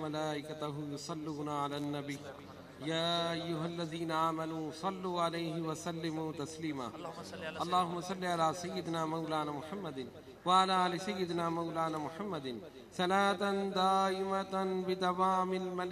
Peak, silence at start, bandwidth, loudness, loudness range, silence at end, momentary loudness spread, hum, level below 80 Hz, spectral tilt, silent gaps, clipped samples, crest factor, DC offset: -16 dBFS; 0 s; 15 kHz; -35 LUFS; 5 LU; 0 s; 12 LU; none; -72 dBFS; -5 dB/octave; none; under 0.1%; 20 dB; under 0.1%